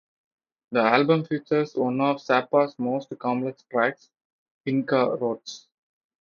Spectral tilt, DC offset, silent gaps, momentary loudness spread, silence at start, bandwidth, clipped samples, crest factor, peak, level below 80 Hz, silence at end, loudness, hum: -6.5 dB/octave; under 0.1%; 4.25-4.64 s; 9 LU; 0.7 s; 7.2 kHz; under 0.1%; 20 dB; -4 dBFS; -74 dBFS; 0.65 s; -24 LUFS; none